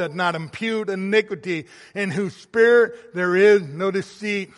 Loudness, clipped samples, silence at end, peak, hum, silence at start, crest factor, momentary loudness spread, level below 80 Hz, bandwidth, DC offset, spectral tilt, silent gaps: -21 LUFS; under 0.1%; 0.15 s; -4 dBFS; none; 0 s; 16 dB; 12 LU; -70 dBFS; 11.5 kHz; under 0.1%; -5.5 dB/octave; none